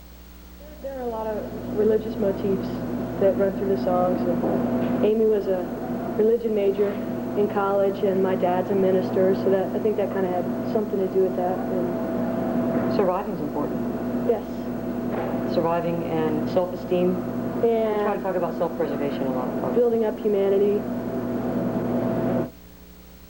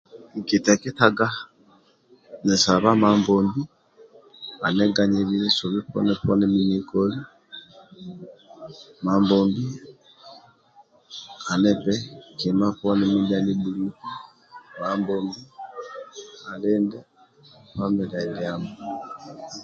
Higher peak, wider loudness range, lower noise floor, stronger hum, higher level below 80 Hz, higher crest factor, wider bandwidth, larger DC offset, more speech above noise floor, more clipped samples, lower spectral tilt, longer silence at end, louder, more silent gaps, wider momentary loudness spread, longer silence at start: second, -8 dBFS vs 0 dBFS; second, 3 LU vs 8 LU; second, -45 dBFS vs -57 dBFS; neither; first, -48 dBFS vs -56 dBFS; second, 14 dB vs 24 dB; first, 17 kHz vs 7.6 kHz; first, 0.1% vs under 0.1%; second, 23 dB vs 35 dB; neither; first, -8 dB/octave vs -5 dB/octave; about the same, 0 s vs 0 s; about the same, -24 LUFS vs -22 LUFS; neither; second, 7 LU vs 21 LU; second, 0 s vs 0.15 s